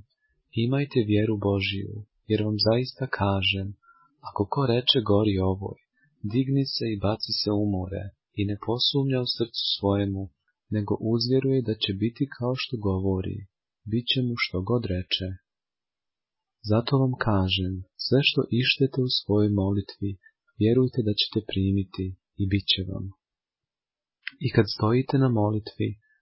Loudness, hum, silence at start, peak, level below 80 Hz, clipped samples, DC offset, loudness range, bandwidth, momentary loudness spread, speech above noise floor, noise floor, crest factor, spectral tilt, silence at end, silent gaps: -26 LUFS; none; 0.55 s; -6 dBFS; -46 dBFS; under 0.1%; under 0.1%; 4 LU; 5.8 kHz; 12 LU; over 65 dB; under -90 dBFS; 20 dB; -9.5 dB/octave; 0.25 s; none